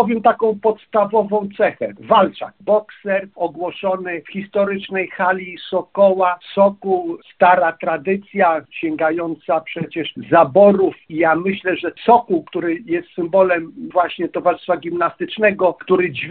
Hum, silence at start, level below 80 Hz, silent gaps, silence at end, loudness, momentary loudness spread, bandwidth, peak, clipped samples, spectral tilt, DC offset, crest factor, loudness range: none; 0 s; -60 dBFS; none; 0 s; -18 LUFS; 10 LU; 4.4 kHz; 0 dBFS; under 0.1%; -4 dB/octave; under 0.1%; 18 dB; 4 LU